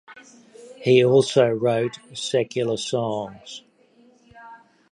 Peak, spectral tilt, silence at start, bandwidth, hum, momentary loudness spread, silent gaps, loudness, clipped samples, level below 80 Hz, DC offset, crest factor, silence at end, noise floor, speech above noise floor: -2 dBFS; -5.5 dB/octave; 0.1 s; 10.5 kHz; none; 18 LU; none; -21 LUFS; under 0.1%; -66 dBFS; under 0.1%; 20 dB; 0.35 s; -56 dBFS; 35 dB